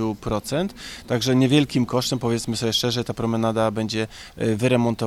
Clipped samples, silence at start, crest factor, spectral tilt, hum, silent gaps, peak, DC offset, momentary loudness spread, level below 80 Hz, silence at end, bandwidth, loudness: under 0.1%; 0 s; 18 dB; -5.5 dB/octave; none; none; -4 dBFS; under 0.1%; 8 LU; -48 dBFS; 0 s; 15.5 kHz; -22 LUFS